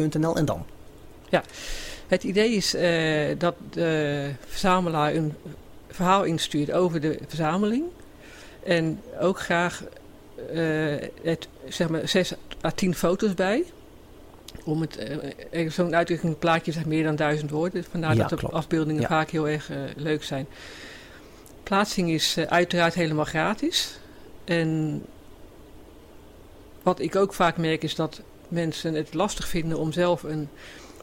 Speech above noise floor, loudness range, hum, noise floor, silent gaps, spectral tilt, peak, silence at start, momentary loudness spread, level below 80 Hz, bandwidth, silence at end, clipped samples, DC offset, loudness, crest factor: 22 dB; 4 LU; none; -47 dBFS; none; -5 dB/octave; -8 dBFS; 0 s; 15 LU; -48 dBFS; 16 kHz; 0 s; under 0.1%; under 0.1%; -25 LUFS; 18 dB